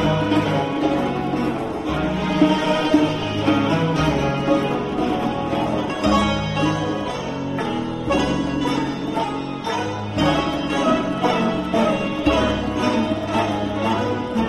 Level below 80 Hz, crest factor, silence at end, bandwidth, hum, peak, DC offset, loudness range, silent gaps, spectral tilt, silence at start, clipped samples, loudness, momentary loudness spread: -38 dBFS; 18 dB; 0 s; 12.5 kHz; none; -4 dBFS; under 0.1%; 3 LU; none; -6 dB/octave; 0 s; under 0.1%; -21 LUFS; 6 LU